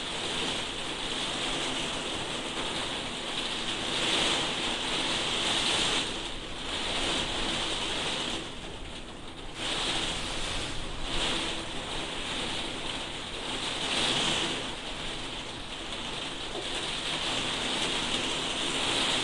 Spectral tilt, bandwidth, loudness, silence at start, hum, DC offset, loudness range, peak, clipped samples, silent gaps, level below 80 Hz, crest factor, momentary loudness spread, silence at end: -2 dB/octave; 11.5 kHz; -30 LUFS; 0 s; none; under 0.1%; 5 LU; -12 dBFS; under 0.1%; none; -46 dBFS; 20 dB; 9 LU; 0 s